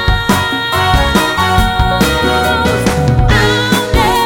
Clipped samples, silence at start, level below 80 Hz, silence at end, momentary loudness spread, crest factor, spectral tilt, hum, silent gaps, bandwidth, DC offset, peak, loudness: under 0.1%; 0 s; -18 dBFS; 0 s; 2 LU; 12 dB; -4.5 dB/octave; none; none; 17 kHz; 0.5%; 0 dBFS; -11 LUFS